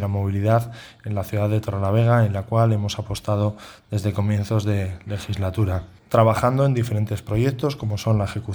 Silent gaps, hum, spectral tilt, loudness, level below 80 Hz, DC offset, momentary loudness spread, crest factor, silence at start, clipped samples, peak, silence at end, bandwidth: none; none; -7.5 dB/octave; -22 LUFS; -46 dBFS; under 0.1%; 11 LU; 18 dB; 0 s; under 0.1%; -2 dBFS; 0 s; 20 kHz